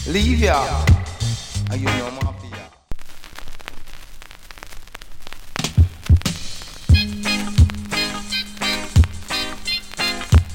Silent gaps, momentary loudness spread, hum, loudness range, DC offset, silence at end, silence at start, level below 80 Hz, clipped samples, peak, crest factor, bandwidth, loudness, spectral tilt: none; 22 LU; none; 13 LU; under 0.1%; 0 s; 0 s; -28 dBFS; under 0.1%; -2 dBFS; 18 dB; 16.5 kHz; -20 LUFS; -5 dB/octave